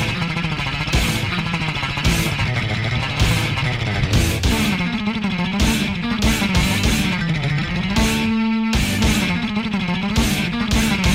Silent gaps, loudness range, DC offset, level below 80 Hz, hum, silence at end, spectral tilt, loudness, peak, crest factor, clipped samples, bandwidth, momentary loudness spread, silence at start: none; 1 LU; 0.3%; -28 dBFS; none; 0 s; -4.5 dB/octave; -19 LUFS; -4 dBFS; 16 dB; under 0.1%; 16 kHz; 4 LU; 0 s